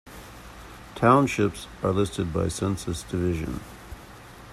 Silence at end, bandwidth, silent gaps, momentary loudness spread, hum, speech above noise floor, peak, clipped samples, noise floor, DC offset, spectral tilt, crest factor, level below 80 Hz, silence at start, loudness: 0 s; 14.5 kHz; none; 24 LU; none; 21 dB; -6 dBFS; under 0.1%; -45 dBFS; under 0.1%; -6 dB/octave; 22 dB; -46 dBFS; 0.05 s; -25 LUFS